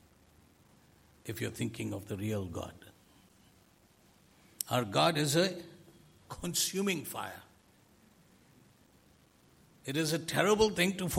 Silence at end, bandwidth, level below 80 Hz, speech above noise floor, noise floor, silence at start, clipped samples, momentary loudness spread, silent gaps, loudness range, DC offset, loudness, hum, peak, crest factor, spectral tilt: 0 s; 16.5 kHz; -62 dBFS; 32 dB; -65 dBFS; 1.25 s; under 0.1%; 19 LU; none; 9 LU; under 0.1%; -32 LUFS; none; -8 dBFS; 28 dB; -4 dB/octave